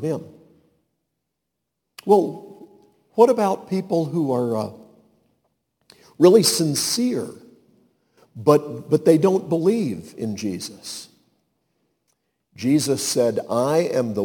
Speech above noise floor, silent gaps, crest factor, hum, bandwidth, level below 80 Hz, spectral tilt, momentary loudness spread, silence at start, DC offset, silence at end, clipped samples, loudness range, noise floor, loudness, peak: 60 dB; none; 20 dB; none; 19 kHz; -68 dBFS; -5 dB/octave; 15 LU; 0 s; under 0.1%; 0 s; under 0.1%; 6 LU; -80 dBFS; -20 LUFS; -2 dBFS